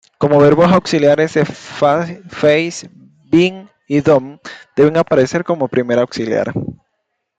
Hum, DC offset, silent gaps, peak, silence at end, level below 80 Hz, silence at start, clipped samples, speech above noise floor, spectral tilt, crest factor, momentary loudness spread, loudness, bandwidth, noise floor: none; under 0.1%; none; -2 dBFS; 0.65 s; -52 dBFS; 0.2 s; under 0.1%; 58 dB; -6.5 dB/octave; 14 dB; 12 LU; -14 LUFS; 9.2 kHz; -71 dBFS